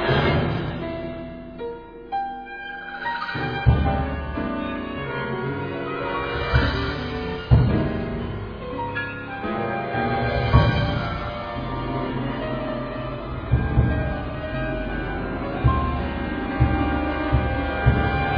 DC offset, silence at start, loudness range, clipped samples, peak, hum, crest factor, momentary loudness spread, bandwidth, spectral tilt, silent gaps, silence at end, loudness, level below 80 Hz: under 0.1%; 0 s; 3 LU; under 0.1%; -2 dBFS; none; 20 dB; 11 LU; 5.2 kHz; -9 dB/octave; none; 0 s; -25 LUFS; -30 dBFS